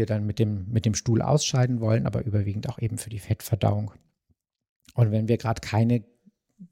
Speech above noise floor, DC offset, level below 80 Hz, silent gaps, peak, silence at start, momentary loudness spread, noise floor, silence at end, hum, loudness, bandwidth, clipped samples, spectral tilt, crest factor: 48 dB; under 0.1%; -52 dBFS; 4.69-4.80 s; -8 dBFS; 0 s; 8 LU; -72 dBFS; 0.05 s; none; -26 LUFS; 16 kHz; under 0.1%; -6 dB/octave; 18 dB